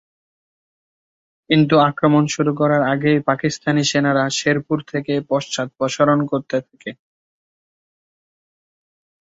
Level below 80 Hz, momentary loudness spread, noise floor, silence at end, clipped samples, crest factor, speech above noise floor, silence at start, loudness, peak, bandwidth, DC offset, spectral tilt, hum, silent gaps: -60 dBFS; 9 LU; under -90 dBFS; 2.35 s; under 0.1%; 18 dB; over 72 dB; 1.5 s; -18 LUFS; -2 dBFS; 8 kHz; under 0.1%; -5.5 dB/octave; none; none